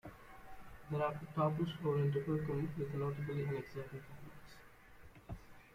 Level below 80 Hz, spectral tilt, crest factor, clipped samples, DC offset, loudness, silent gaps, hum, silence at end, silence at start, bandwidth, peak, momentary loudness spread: -62 dBFS; -8.5 dB/octave; 20 dB; under 0.1%; under 0.1%; -39 LUFS; none; none; 0 s; 0.05 s; 15 kHz; -22 dBFS; 21 LU